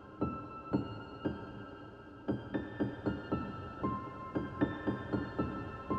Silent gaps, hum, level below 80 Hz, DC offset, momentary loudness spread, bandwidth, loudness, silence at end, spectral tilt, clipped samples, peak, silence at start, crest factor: none; none; -56 dBFS; under 0.1%; 9 LU; 6.4 kHz; -39 LUFS; 0 s; -9 dB/octave; under 0.1%; -20 dBFS; 0 s; 20 dB